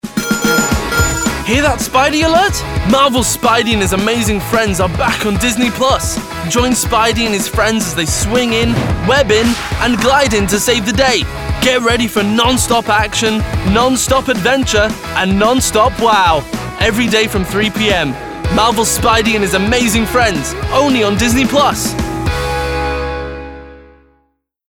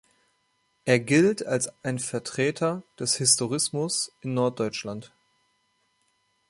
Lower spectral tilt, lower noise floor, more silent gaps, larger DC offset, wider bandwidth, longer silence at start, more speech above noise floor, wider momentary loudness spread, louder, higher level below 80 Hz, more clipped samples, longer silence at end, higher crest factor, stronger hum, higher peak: about the same, -3.5 dB/octave vs -3.5 dB/octave; second, -62 dBFS vs -71 dBFS; neither; neither; first, over 20 kHz vs 11.5 kHz; second, 0.05 s vs 0.85 s; about the same, 49 dB vs 46 dB; second, 6 LU vs 10 LU; first, -13 LUFS vs -25 LUFS; first, -26 dBFS vs -68 dBFS; neither; second, 0.9 s vs 1.45 s; second, 12 dB vs 22 dB; neither; first, 0 dBFS vs -4 dBFS